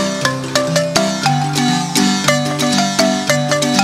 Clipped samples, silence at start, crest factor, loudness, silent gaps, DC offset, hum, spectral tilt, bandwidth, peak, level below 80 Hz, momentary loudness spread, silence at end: under 0.1%; 0 s; 16 dB; -15 LUFS; none; under 0.1%; none; -3.5 dB/octave; 16 kHz; 0 dBFS; -50 dBFS; 3 LU; 0 s